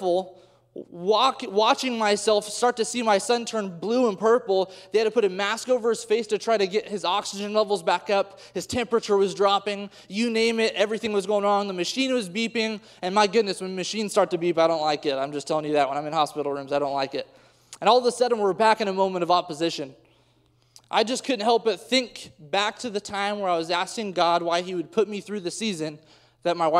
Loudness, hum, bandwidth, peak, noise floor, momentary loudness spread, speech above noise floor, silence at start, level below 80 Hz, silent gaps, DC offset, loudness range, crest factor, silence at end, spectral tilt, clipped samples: -24 LUFS; none; 14 kHz; -6 dBFS; -63 dBFS; 9 LU; 39 dB; 0 s; -68 dBFS; none; under 0.1%; 3 LU; 20 dB; 0 s; -3.5 dB/octave; under 0.1%